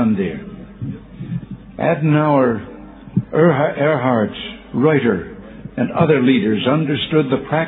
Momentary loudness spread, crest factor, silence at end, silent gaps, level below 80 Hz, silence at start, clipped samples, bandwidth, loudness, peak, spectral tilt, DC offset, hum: 17 LU; 16 dB; 0 s; none; -48 dBFS; 0 s; under 0.1%; 4.1 kHz; -17 LUFS; 0 dBFS; -11 dB/octave; under 0.1%; none